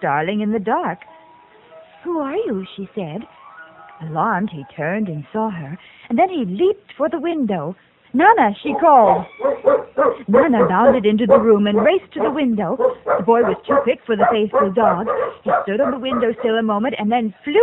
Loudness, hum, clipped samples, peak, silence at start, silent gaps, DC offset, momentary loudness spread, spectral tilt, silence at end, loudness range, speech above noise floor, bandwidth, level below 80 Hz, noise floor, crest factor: -17 LUFS; none; under 0.1%; 0 dBFS; 0 s; none; under 0.1%; 13 LU; -9 dB/octave; 0 s; 10 LU; 30 dB; 4.1 kHz; -54 dBFS; -47 dBFS; 18 dB